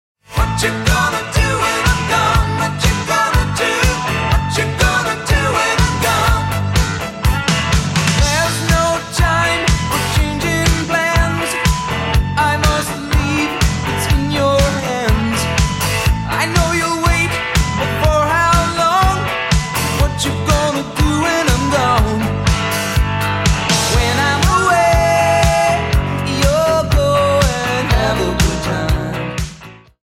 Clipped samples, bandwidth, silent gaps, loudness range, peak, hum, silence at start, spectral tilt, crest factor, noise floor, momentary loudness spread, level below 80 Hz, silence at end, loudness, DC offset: under 0.1%; 16.5 kHz; none; 2 LU; 0 dBFS; none; 0.3 s; -4.5 dB/octave; 14 dB; -37 dBFS; 4 LU; -22 dBFS; 0.25 s; -15 LUFS; under 0.1%